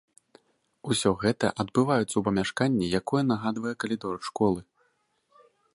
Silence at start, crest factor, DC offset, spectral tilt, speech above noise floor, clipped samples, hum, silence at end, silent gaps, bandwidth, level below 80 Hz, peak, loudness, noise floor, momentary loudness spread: 0.85 s; 20 dB; under 0.1%; -5.5 dB/octave; 45 dB; under 0.1%; none; 1.15 s; none; 11.5 kHz; -56 dBFS; -8 dBFS; -27 LUFS; -71 dBFS; 7 LU